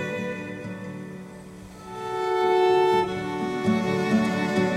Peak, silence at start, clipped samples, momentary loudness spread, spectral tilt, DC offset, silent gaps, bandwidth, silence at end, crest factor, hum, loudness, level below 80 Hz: -10 dBFS; 0 s; under 0.1%; 20 LU; -6 dB/octave; under 0.1%; none; 13.5 kHz; 0 s; 14 dB; none; -24 LUFS; -58 dBFS